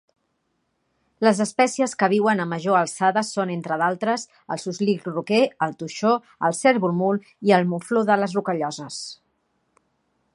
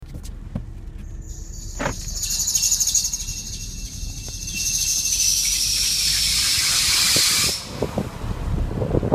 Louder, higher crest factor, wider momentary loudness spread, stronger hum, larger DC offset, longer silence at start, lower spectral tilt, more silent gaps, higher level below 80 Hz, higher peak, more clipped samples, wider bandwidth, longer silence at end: second, -22 LUFS vs -19 LUFS; about the same, 20 dB vs 22 dB; second, 9 LU vs 20 LU; neither; neither; first, 1.2 s vs 0 s; first, -5 dB/octave vs -1.5 dB/octave; neither; second, -72 dBFS vs -34 dBFS; about the same, -2 dBFS vs 0 dBFS; neither; second, 11.5 kHz vs 15.5 kHz; first, 1.2 s vs 0 s